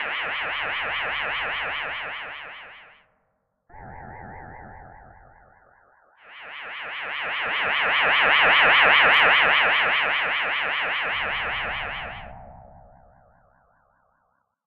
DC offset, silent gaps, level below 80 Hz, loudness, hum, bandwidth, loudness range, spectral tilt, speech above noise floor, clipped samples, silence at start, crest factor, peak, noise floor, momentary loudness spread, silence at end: under 0.1%; none; -54 dBFS; -20 LUFS; none; 6.8 kHz; 20 LU; -4 dB/octave; 50 dB; under 0.1%; 0 s; 20 dB; -4 dBFS; -72 dBFS; 26 LU; 2 s